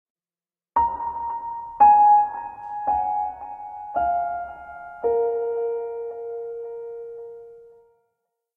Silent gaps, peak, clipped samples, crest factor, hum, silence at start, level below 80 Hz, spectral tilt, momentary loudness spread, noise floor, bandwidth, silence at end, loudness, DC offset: none; -6 dBFS; under 0.1%; 18 dB; none; 0.75 s; -56 dBFS; -8.5 dB/octave; 20 LU; under -90 dBFS; 3 kHz; 0.9 s; -22 LUFS; under 0.1%